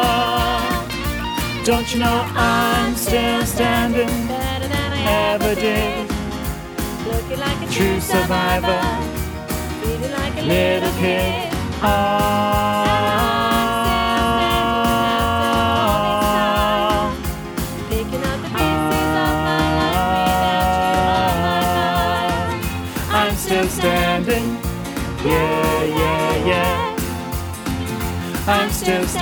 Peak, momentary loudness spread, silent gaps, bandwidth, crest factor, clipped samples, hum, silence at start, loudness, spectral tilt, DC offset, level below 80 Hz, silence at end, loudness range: -2 dBFS; 8 LU; none; over 20 kHz; 18 dB; under 0.1%; none; 0 s; -19 LUFS; -4.5 dB/octave; under 0.1%; -30 dBFS; 0 s; 3 LU